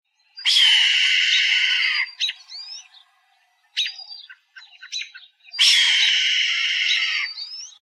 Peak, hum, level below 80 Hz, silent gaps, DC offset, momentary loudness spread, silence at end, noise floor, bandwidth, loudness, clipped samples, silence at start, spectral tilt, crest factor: -4 dBFS; none; under -90 dBFS; none; under 0.1%; 21 LU; 0.1 s; -63 dBFS; 14 kHz; -17 LUFS; under 0.1%; 0.35 s; 13 dB/octave; 16 dB